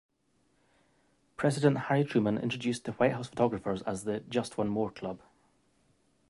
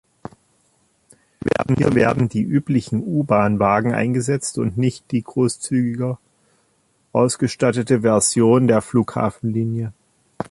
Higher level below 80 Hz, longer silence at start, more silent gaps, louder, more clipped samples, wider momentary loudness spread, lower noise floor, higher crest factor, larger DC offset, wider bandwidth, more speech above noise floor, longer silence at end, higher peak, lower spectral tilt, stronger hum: second, -64 dBFS vs -50 dBFS; about the same, 1.4 s vs 1.45 s; neither; second, -31 LUFS vs -19 LUFS; neither; about the same, 9 LU vs 10 LU; first, -72 dBFS vs -63 dBFS; first, 22 dB vs 16 dB; neither; about the same, 11.5 kHz vs 11.5 kHz; about the same, 42 dB vs 45 dB; first, 1.15 s vs 0.05 s; second, -12 dBFS vs -2 dBFS; about the same, -6.5 dB/octave vs -6 dB/octave; neither